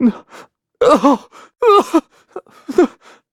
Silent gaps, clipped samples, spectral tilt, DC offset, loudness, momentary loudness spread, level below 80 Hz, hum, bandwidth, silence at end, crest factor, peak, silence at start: none; under 0.1%; -5.5 dB/octave; under 0.1%; -14 LUFS; 24 LU; -54 dBFS; none; 15.5 kHz; 0.45 s; 16 dB; 0 dBFS; 0 s